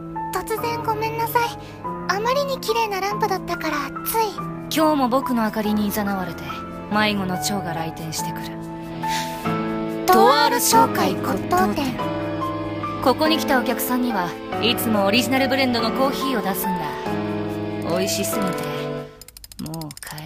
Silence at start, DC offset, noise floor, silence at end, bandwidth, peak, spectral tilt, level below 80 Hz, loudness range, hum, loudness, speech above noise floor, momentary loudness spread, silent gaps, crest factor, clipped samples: 0 s; under 0.1%; -42 dBFS; 0 s; 16 kHz; -2 dBFS; -4 dB/octave; -48 dBFS; 6 LU; none; -21 LUFS; 21 dB; 12 LU; none; 20 dB; under 0.1%